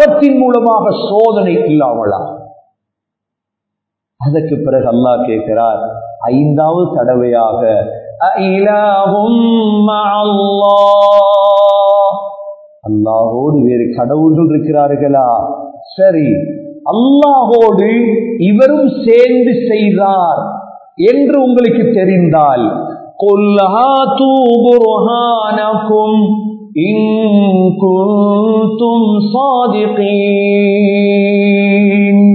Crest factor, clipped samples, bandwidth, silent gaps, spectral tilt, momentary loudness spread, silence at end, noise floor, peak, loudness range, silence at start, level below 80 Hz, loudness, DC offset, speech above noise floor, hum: 10 dB; 0.4%; 4.7 kHz; none; -9 dB/octave; 8 LU; 0 s; -79 dBFS; 0 dBFS; 4 LU; 0 s; -52 dBFS; -10 LUFS; under 0.1%; 70 dB; none